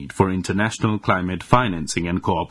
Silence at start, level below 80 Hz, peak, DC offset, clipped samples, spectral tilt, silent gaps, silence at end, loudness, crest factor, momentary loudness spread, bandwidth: 0 s; -44 dBFS; 0 dBFS; under 0.1%; under 0.1%; -5.5 dB/octave; none; 0.05 s; -21 LUFS; 20 dB; 4 LU; 12 kHz